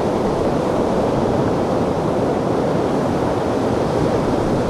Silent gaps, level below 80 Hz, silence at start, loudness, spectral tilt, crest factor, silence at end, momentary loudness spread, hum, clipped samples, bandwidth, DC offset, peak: none; -36 dBFS; 0 s; -19 LUFS; -7 dB/octave; 12 dB; 0 s; 1 LU; none; under 0.1%; 14.5 kHz; under 0.1%; -6 dBFS